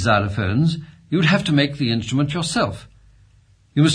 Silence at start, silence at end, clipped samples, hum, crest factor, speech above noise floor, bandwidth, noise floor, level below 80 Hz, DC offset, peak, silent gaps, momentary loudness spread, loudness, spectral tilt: 0 s; 0 s; under 0.1%; 50 Hz at -40 dBFS; 18 dB; 35 dB; 10.5 kHz; -54 dBFS; -48 dBFS; under 0.1%; -2 dBFS; none; 8 LU; -20 LUFS; -5.5 dB/octave